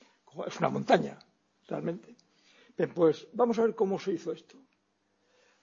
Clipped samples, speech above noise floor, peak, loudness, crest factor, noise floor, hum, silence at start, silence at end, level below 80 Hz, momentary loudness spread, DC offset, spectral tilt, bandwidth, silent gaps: under 0.1%; 45 dB; -8 dBFS; -30 LUFS; 24 dB; -75 dBFS; none; 0.35 s; 1.25 s; -76 dBFS; 15 LU; under 0.1%; -6.5 dB/octave; 7.4 kHz; none